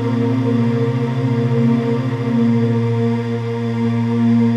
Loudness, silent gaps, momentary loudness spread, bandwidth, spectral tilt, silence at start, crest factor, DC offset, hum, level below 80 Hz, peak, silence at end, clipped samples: -17 LUFS; none; 4 LU; 7.6 kHz; -9 dB/octave; 0 s; 12 dB; 0.1%; none; -58 dBFS; -4 dBFS; 0 s; under 0.1%